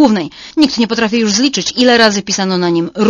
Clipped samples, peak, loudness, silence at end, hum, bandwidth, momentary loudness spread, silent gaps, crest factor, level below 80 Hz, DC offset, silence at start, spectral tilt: 0.2%; 0 dBFS; -12 LUFS; 0 s; none; 11 kHz; 6 LU; none; 12 dB; -48 dBFS; under 0.1%; 0 s; -3.5 dB/octave